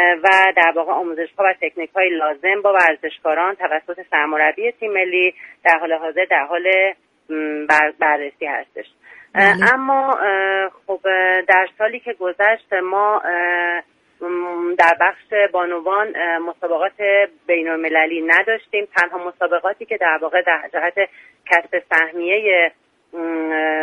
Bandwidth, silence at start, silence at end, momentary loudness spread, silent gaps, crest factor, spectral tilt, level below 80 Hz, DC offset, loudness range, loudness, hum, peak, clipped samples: 11 kHz; 0 s; 0 s; 10 LU; none; 18 dB; -4.5 dB/octave; -70 dBFS; under 0.1%; 2 LU; -17 LUFS; none; 0 dBFS; under 0.1%